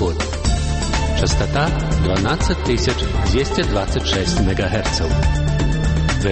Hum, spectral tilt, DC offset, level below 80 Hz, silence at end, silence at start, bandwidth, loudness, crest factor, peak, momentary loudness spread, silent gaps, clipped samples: none; -5 dB/octave; under 0.1%; -22 dBFS; 0 s; 0 s; 8.8 kHz; -19 LUFS; 14 dB; -4 dBFS; 2 LU; none; under 0.1%